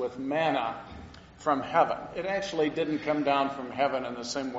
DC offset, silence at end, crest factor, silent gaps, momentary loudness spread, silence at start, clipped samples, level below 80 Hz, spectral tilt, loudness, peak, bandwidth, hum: under 0.1%; 0 s; 20 dB; none; 9 LU; 0 s; under 0.1%; -60 dBFS; -3 dB/octave; -29 LUFS; -10 dBFS; 8 kHz; none